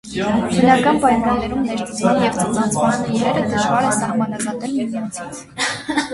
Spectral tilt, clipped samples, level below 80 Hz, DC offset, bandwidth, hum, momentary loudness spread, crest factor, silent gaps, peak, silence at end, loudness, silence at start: -4.5 dB/octave; under 0.1%; -44 dBFS; under 0.1%; 11.5 kHz; none; 9 LU; 18 dB; none; 0 dBFS; 0 s; -18 LUFS; 0.05 s